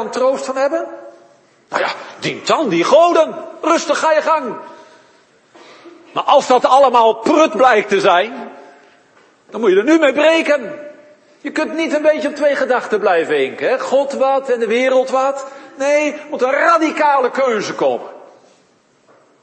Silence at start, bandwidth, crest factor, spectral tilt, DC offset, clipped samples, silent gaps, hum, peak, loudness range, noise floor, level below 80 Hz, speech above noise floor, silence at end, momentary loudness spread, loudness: 0 s; 8.8 kHz; 16 dB; -3.5 dB/octave; under 0.1%; under 0.1%; none; none; 0 dBFS; 4 LU; -54 dBFS; -66 dBFS; 40 dB; 1.2 s; 13 LU; -15 LUFS